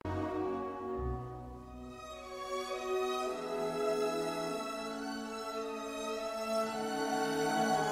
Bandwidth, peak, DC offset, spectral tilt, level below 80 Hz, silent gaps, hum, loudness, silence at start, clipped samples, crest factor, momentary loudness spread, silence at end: 16 kHz; -20 dBFS; under 0.1%; -4.5 dB/octave; -54 dBFS; none; none; -37 LUFS; 0.05 s; under 0.1%; 16 dB; 13 LU; 0 s